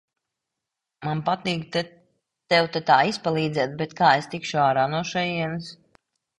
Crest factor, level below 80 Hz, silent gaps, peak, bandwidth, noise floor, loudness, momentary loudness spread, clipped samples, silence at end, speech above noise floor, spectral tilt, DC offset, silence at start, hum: 22 dB; -64 dBFS; none; -4 dBFS; 11.5 kHz; -85 dBFS; -23 LUFS; 11 LU; under 0.1%; 0.65 s; 62 dB; -5 dB/octave; under 0.1%; 1 s; none